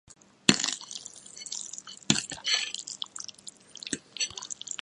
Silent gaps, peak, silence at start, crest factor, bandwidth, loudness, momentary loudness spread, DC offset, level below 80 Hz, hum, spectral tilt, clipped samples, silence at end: none; 0 dBFS; 0.1 s; 34 dB; 16 kHz; -30 LUFS; 17 LU; under 0.1%; -68 dBFS; none; -1.5 dB/octave; under 0.1%; 0.05 s